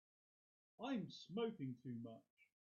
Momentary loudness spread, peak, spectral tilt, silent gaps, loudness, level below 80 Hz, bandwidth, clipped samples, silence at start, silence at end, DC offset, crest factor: 9 LU; -32 dBFS; -5.5 dB/octave; 2.30-2.37 s; -49 LUFS; under -90 dBFS; 7 kHz; under 0.1%; 0.8 s; 0.2 s; under 0.1%; 18 dB